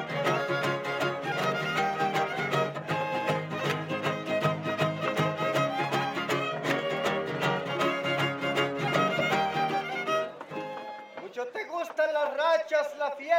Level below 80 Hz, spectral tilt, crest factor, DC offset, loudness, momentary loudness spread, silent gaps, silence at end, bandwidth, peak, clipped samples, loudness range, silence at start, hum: -76 dBFS; -5 dB/octave; 18 dB; under 0.1%; -29 LUFS; 8 LU; none; 0 s; 17 kHz; -12 dBFS; under 0.1%; 2 LU; 0 s; none